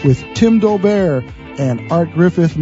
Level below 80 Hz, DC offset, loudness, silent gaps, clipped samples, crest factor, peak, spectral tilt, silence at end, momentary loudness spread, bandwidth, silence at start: -40 dBFS; under 0.1%; -14 LUFS; none; under 0.1%; 12 dB; 0 dBFS; -8 dB/octave; 0 s; 9 LU; 8 kHz; 0 s